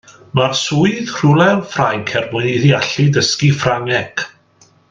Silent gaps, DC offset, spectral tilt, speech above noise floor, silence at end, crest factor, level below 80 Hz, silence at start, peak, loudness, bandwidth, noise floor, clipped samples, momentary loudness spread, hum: none; under 0.1%; -5 dB/octave; 37 dB; 0.65 s; 16 dB; -50 dBFS; 0.35 s; 0 dBFS; -15 LUFS; 7.6 kHz; -51 dBFS; under 0.1%; 6 LU; none